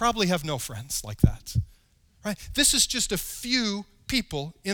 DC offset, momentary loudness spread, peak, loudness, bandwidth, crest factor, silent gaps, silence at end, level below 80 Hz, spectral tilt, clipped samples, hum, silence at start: under 0.1%; 14 LU; -4 dBFS; -26 LUFS; over 20 kHz; 24 dB; none; 0 s; -40 dBFS; -3 dB/octave; under 0.1%; none; 0 s